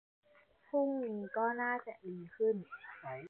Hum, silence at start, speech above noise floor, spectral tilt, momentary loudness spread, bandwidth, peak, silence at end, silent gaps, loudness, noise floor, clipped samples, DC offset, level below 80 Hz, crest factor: none; 0.75 s; 30 dB; -6 dB/octave; 13 LU; 4 kHz; -22 dBFS; 0 s; none; -37 LUFS; -67 dBFS; under 0.1%; under 0.1%; -86 dBFS; 16 dB